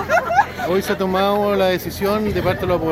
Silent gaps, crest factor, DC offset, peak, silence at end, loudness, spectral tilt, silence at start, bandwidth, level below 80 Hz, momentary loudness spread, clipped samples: none; 16 dB; under 0.1%; -2 dBFS; 0 s; -19 LUFS; -5.5 dB/octave; 0 s; 16.5 kHz; -42 dBFS; 4 LU; under 0.1%